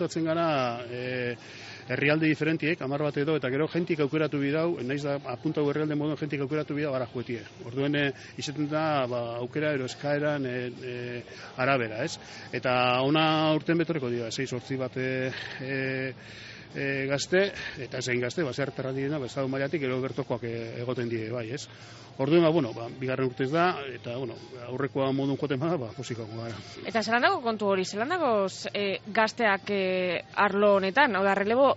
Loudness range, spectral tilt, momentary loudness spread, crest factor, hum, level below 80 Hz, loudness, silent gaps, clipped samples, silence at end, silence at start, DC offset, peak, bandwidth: 4 LU; -4 dB/octave; 13 LU; 20 dB; none; -66 dBFS; -28 LUFS; none; under 0.1%; 0 s; 0 s; under 0.1%; -8 dBFS; 8 kHz